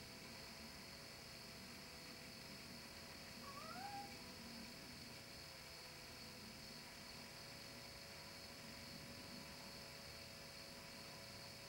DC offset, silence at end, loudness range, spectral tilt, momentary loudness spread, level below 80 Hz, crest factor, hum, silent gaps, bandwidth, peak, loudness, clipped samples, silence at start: under 0.1%; 0 s; 1 LU; -3 dB/octave; 2 LU; -72 dBFS; 16 dB; none; none; 16.5 kHz; -40 dBFS; -54 LUFS; under 0.1%; 0 s